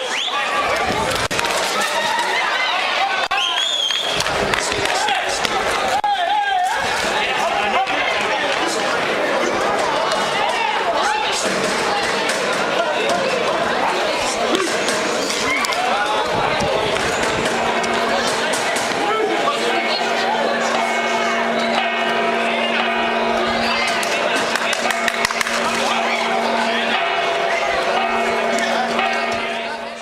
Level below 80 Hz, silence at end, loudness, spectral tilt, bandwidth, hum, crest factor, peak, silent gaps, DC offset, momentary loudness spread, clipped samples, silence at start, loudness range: -48 dBFS; 0 s; -18 LUFS; -2 dB/octave; 16 kHz; none; 16 dB; -4 dBFS; none; under 0.1%; 1 LU; under 0.1%; 0 s; 1 LU